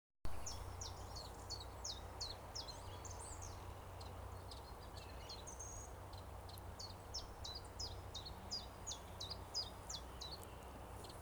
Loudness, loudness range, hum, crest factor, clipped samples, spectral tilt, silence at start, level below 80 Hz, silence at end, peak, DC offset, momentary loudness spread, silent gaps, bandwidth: -50 LUFS; 4 LU; none; 18 dB; under 0.1%; -3 dB/octave; 0.15 s; -58 dBFS; 0 s; -32 dBFS; under 0.1%; 7 LU; none; over 20 kHz